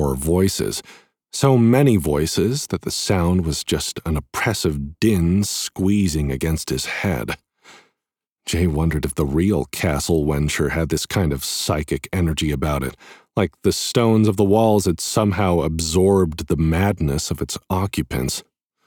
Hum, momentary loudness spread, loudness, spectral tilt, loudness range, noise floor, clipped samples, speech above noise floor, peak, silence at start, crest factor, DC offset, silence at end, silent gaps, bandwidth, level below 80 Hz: none; 8 LU; -20 LUFS; -5.5 dB/octave; 5 LU; -85 dBFS; under 0.1%; 66 dB; -4 dBFS; 0 s; 16 dB; under 0.1%; 0.45 s; 8.32-8.36 s; 19.5 kHz; -34 dBFS